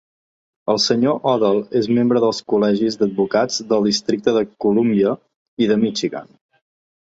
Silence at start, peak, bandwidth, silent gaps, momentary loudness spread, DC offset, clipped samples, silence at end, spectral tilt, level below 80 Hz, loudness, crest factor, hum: 0.65 s; -2 dBFS; 8 kHz; 5.36-5.57 s; 6 LU; under 0.1%; under 0.1%; 0.8 s; -5 dB/octave; -60 dBFS; -18 LUFS; 16 dB; none